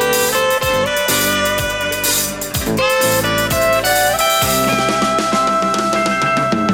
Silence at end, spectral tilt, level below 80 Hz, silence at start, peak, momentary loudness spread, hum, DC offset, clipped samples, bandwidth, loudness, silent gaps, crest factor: 0 s; -3 dB/octave; -38 dBFS; 0 s; -4 dBFS; 3 LU; none; under 0.1%; under 0.1%; 19.5 kHz; -15 LUFS; none; 12 dB